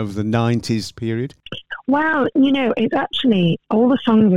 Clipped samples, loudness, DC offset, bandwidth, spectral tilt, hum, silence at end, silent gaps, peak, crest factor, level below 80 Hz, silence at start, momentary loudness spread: under 0.1%; -18 LUFS; under 0.1%; 11.5 kHz; -6.5 dB/octave; none; 0 s; none; -4 dBFS; 12 dB; -54 dBFS; 0 s; 10 LU